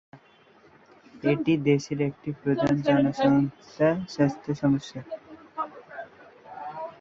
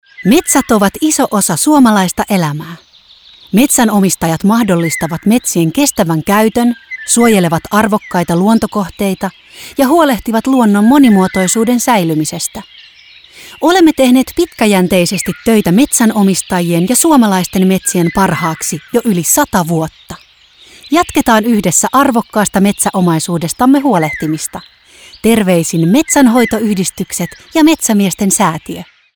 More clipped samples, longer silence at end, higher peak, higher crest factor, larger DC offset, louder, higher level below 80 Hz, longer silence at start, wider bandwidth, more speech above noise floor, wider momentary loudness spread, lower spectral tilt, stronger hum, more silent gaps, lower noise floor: neither; second, 0.1 s vs 0.3 s; second, -8 dBFS vs 0 dBFS; first, 18 dB vs 12 dB; neither; second, -26 LUFS vs -11 LUFS; second, -60 dBFS vs -42 dBFS; about the same, 0.15 s vs 0.2 s; second, 7.4 kHz vs over 20 kHz; about the same, 32 dB vs 32 dB; first, 19 LU vs 9 LU; first, -7.5 dB/octave vs -4.5 dB/octave; neither; neither; first, -57 dBFS vs -43 dBFS